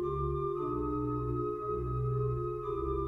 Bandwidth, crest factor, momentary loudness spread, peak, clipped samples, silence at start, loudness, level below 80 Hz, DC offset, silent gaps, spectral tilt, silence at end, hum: 4 kHz; 12 dB; 3 LU; -22 dBFS; under 0.1%; 0 s; -34 LUFS; -44 dBFS; under 0.1%; none; -11.5 dB/octave; 0 s; none